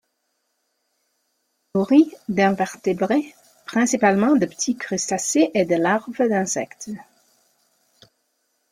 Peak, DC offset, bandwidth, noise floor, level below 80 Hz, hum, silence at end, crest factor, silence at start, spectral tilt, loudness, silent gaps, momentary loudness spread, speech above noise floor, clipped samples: -2 dBFS; under 0.1%; 14.5 kHz; -73 dBFS; -64 dBFS; none; 1.7 s; 20 dB; 1.75 s; -4.5 dB/octave; -20 LUFS; none; 12 LU; 53 dB; under 0.1%